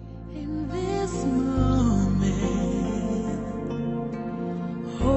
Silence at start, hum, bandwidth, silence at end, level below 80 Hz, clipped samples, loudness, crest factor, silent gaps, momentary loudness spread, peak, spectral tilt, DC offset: 0 s; none; 8.4 kHz; 0 s; -36 dBFS; under 0.1%; -27 LUFS; 16 dB; none; 9 LU; -10 dBFS; -7.5 dB/octave; under 0.1%